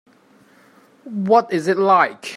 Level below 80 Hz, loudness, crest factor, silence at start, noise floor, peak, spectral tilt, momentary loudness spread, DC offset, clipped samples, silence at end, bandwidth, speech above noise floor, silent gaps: -72 dBFS; -17 LUFS; 18 dB; 1.05 s; -53 dBFS; -2 dBFS; -6 dB/octave; 11 LU; under 0.1%; under 0.1%; 0 s; 13 kHz; 36 dB; none